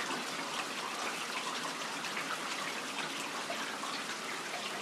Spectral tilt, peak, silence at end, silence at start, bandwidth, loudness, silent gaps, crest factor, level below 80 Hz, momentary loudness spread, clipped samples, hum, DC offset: -1 dB/octave; -24 dBFS; 0 s; 0 s; 16 kHz; -37 LUFS; none; 14 dB; -88 dBFS; 1 LU; under 0.1%; none; under 0.1%